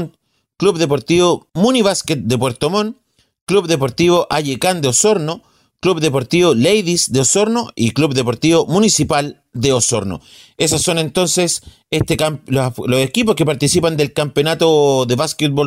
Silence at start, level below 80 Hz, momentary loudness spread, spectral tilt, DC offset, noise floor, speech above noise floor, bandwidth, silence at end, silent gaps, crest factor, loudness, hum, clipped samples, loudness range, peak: 0 s; -46 dBFS; 6 LU; -4 dB/octave; under 0.1%; -58 dBFS; 43 dB; 16 kHz; 0 s; 3.41-3.47 s; 14 dB; -15 LUFS; none; under 0.1%; 2 LU; -2 dBFS